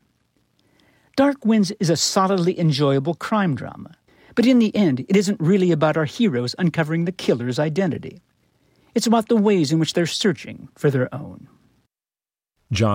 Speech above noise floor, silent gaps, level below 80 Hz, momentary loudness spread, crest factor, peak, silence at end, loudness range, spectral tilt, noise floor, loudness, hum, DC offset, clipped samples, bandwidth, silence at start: over 71 dB; none; -58 dBFS; 11 LU; 16 dB; -6 dBFS; 0 s; 3 LU; -5.5 dB/octave; under -90 dBFS; -20 LUFS; none; under 0.1%; under 0.1%; 16 kHz; 1.15 s